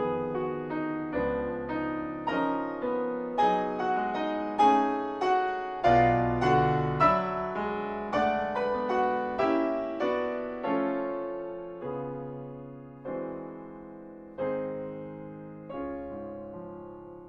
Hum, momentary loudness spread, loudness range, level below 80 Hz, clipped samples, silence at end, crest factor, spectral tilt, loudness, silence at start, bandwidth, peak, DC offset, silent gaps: none; 18 LU; 12 LU; -54 dBFS; under 0.1%; 0 s; 18 dB; -7.5 dB/octave; -29 LUFS; 0 s; 8.4 kHz; -10 dBFS; under 0.1%; none